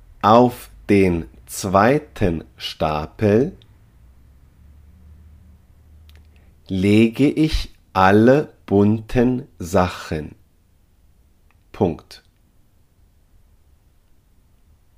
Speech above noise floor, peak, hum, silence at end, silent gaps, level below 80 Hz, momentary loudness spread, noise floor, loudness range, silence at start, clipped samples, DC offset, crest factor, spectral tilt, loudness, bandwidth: 39 dB; 0 dBFS; none; 2.8 s; none; -40 dBFS; 14 LU; -56 dBFS; 14 LU; 0.25 s; under 0.1%; under 0.1%; 20 dB; -6.5 dB/octave; -18 LUFS; 15.5 kHz